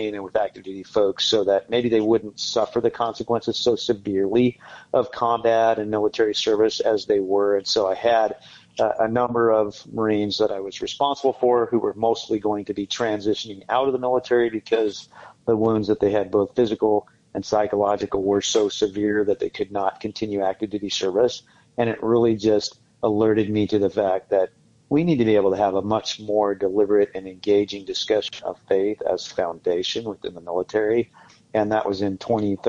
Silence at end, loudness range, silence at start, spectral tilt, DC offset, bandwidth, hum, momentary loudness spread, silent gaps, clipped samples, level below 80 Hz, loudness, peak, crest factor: 0 s; 3 LU; 0 s; -5 dB/octave; under 0.1%; 7.8 kHz; none; 8 LU; none; under 0.1%; -58 dBFS; -22 LUFS; -8 dBFS; 14 dB